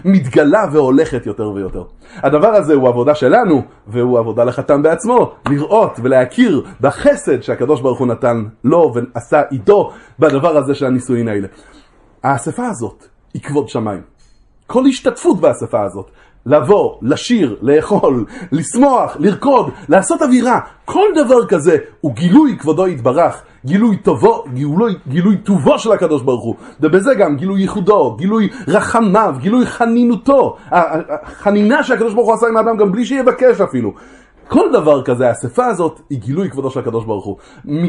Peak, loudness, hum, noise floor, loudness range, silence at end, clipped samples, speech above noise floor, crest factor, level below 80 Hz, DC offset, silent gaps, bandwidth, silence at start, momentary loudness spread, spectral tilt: 0 dBFS; -13 LUFS; none; -48 dBFS; 4 LU; 0 s; under 0.1%; 35 dB; 12 dB; -46 dBFS; under 0.1%; none; 11.5 kHz; 0.05 s; 10 LU; -6.5 dB/octave